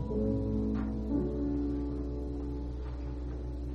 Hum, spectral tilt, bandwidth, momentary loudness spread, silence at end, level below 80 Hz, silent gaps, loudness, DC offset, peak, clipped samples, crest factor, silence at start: none; -10.5 dB/octave; 6 kHz; 8 LU; 0 s; -38 dBFS; none; -35 LUFS; under 0.1%; -20 dBFS; under 0.1%; 12 dB; 0 s